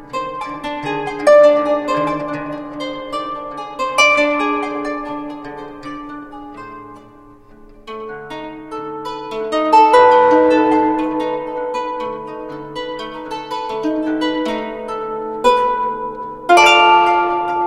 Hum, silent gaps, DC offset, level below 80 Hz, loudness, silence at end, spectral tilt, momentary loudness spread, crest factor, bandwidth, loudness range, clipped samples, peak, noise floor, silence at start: none; none; under 0.1%; -48 dBFS; -16 LUFS; 0 s; -3.5 dB/octave; 20 LU; 16 dB; 12.5 kHz; 16 LU; under 0.1%; 0 dBFS; -42 dBFS; 0 s